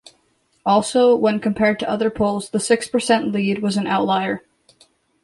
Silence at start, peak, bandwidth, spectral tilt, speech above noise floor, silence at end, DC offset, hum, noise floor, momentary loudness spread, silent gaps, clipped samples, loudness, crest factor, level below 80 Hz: 0.65 s; -4 dBFS; 11.5 kHz; -5 dB/octave; 45 dB; 0.85 s; under 0.1%; none; -63 dBFS; 6 LU; none; under 0.1%; -19 LUFS; 16 dB; -54 dBFS